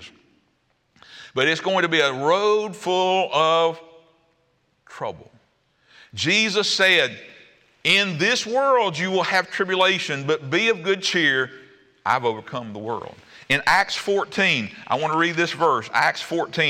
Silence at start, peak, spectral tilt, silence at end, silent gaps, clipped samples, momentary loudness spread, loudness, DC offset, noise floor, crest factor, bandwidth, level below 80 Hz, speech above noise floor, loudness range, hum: 0 s; -6 dBFS; -3.5 dB/octave; 0 s; none; under 0.1%; 13 LU; -20 LUFS; under 0.1%; -67 dBFS; 16 dB; 16.5 kHz; -64 dBFS; 46 dB; 4 LU; none